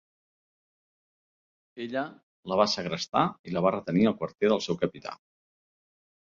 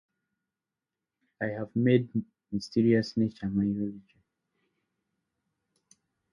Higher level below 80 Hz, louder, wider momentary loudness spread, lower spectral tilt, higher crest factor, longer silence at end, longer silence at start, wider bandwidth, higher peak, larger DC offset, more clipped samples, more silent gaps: about the same, -66 dBFS vs -62 dBFS; about the same, -28 LUFS vs -29 LUFS; first, 15 LU vs 11 LU; second, -5.5 dB/octave vs -8 dB/octave; about the same, 24 dB vs 22 dB; second, 1.15 s vs 2.35 s; first, 1.75 s vs 1.4 s; second, 7.4 kHz vs 10 kHz; about the same, -8 dBFS vs -10 dBFS; neither; neither; first, 2.23-2.43 s, 3.39-3.44 s vs none